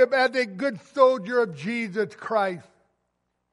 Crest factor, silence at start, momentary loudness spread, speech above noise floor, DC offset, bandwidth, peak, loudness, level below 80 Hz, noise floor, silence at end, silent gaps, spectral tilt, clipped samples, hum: 18 dB; 0 s; 9 LU; 52 dB; under 0.1%; 11.5 kHz; -6 dBFS; -24 LUFS; -76 dBFS; -76 dBFS; 0.9 s; none; -5.5 dB/octave; under 0.1%; 60 Hz at -55 dBFS